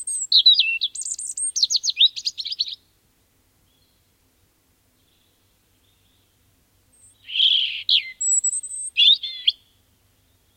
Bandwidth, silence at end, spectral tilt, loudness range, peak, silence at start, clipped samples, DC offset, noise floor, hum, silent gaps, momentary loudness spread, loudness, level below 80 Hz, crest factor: 16.5 kHz; 1.05 s; 5.5 dB/octave; 14 LU; -4 dBFS; 0 s; under 0.1%; under 0.1%; -63 dBFS; none; none; 13 LU; -18 LUFS; -70 dBFS; 20 dB